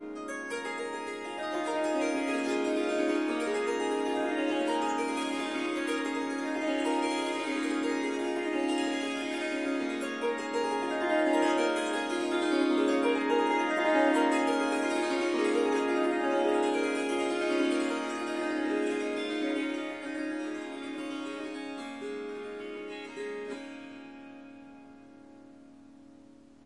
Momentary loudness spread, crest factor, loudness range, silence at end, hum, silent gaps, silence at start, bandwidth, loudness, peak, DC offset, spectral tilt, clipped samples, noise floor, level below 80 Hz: 12 LU; 16 dB; 12 LU; 0.5 s; none; none; 0 s; 11.5 kHz; -30 LUFS; -14 dBFS; under 0.1%; -3 dB/octave; under 0.1%; -55 dBFS; -74 dBFS